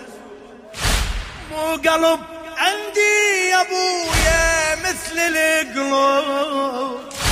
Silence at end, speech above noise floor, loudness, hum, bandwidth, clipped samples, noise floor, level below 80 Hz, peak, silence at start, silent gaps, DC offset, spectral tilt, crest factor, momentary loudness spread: 0 s; 21 dB; -18 LUFS; none; 15.5 kHz; under 0.1%; -39 dBFS; -32 dBFS; -2 dBFS; 0 s; none; under 0.1%; -2.5 dB/octave; 18 dB; 11 LU